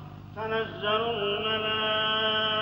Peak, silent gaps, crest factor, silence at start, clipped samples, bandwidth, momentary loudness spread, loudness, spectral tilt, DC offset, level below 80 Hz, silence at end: -14 dBFS; none; 14 dB; 0 s; under 0.1%; 16 kHz; 7 LU; -27 LUFS; -6 dB/octave; under 0.1%; -58 dBFS; 0 s